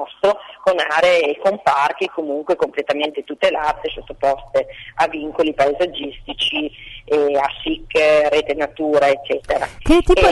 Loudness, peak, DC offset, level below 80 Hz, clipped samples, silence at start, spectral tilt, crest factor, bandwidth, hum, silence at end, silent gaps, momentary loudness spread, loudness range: -18 LUFS; -2 dBFS; under 0.1%; -34 dBFS; under 0.1%; 0 s; -4.5 dB/octave; 16 dB; 11.5 kHz; none; 0 s; none; 9 LU; 3 LU